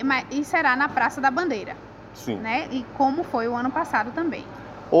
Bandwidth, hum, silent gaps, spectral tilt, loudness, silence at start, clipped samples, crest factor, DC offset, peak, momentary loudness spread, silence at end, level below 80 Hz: 14.5 kHz; none; none; -5 dB/octave; -24 LUFS; 0 s; under 0.1%; 20 dB; under 0.1%; -4 dBFS; 16 LU; 0 s; -56 dBFS